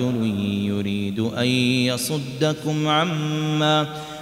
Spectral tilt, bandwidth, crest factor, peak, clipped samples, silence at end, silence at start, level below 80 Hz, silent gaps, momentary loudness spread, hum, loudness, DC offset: -5 dB/octave; 16 kHz; 14 dB; -8 dBFS; under 0.1%; 0 s; 0 s; -58 dBFS; none; 5 LU; none; -22 LUFS; under 0.1%